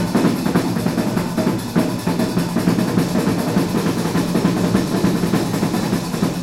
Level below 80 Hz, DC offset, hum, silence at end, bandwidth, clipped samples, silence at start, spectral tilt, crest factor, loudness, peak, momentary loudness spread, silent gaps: -42 dBFS; under 0.1%; none; 0 s; 16 kHz; under 0.1%; 0 s; -6 dB/octave; 16 dB; -19 LUFS; -2 dBFS; 3 LU; none